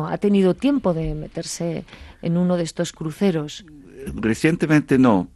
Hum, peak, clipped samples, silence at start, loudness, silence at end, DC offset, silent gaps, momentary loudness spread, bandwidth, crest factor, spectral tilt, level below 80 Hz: none; -4 dBFS; under 0.1%; 0 s; -21 LUFS; 0.1 s; under 0.1%; none; 14 LU; 12.5 kHz; 16 dB; -6.5 dB/octave; -44 dBFS